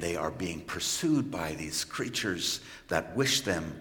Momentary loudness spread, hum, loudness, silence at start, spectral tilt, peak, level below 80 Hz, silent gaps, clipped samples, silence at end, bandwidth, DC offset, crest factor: 8 LU; none; -31 LUFS; 0 s; -3 dB/octave; -10 dBFS; -58 dBFS; none; under 0.1%; 0 s; 17 kHz; under 0.1%; 22 dB